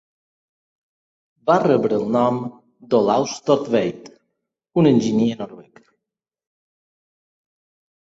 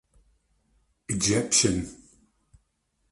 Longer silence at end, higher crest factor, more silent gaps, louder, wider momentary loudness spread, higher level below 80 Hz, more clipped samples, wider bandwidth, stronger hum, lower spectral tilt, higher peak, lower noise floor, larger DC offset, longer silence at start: first, 2.4 s vs 1.15 s; about the same, 20 dB vs 22 dB; neither; first, -19 LUFS vs -24 LUFS; about the same, 12 LU vs 12 LU; second, -62 dBFS vs -52 dBFS; neither; second, 7.8 kHz vs 11.5 kHz; neither; first, -6.5 dB/octave vs -3 dB/octave; first, -2 dBFS vs -8 dBFS; first, -85 dBFS vs -74 dBFS; neither; first, 1.45 s vs 1.1 s